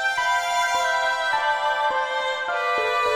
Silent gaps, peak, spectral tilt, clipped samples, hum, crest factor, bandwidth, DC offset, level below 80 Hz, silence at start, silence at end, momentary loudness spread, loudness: none; -10 dBFS; 0.5 dB/octave; under 0.1%; none; 12 dB; 20 kHz; under 0.1%; -60 dBFS; 0 s; 0 s; 3 LU; -22 LUFS